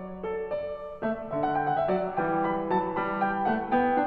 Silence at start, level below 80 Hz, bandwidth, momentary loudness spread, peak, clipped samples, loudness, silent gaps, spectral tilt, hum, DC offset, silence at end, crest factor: 0 s; -56 dBFS; 4.9 kHz; 7 LU; -14 dBFS; under 0.1%; -28 LUFS; none; -9.5 dB/octave; none; under 0.1%; 0 s; 14 dB